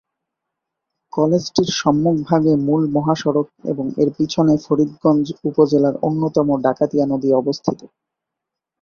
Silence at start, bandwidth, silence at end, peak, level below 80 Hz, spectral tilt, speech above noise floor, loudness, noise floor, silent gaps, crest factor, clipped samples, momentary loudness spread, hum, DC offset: 1.15 s; 7 kHz; 0.95 s; 0 dBFS; -56 dBFS; -7 dB/octave; 66 dB; -18 LUFS; -83 dBFS; none; 18 dB; under 0.1%; 6 LU; none; under 0.1%